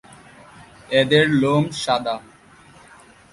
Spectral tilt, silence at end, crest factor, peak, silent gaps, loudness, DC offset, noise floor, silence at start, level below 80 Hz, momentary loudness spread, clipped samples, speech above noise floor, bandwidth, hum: -5.5 dB/octave; 1.15 s; 20 dB; -2 dBFS; none; -19 LUFS; under 0.1%; -48 dBFS; 0.9 s; -56 dBFS; 10 LU; under 0.1%; 30 dB; 11.5 kHz; none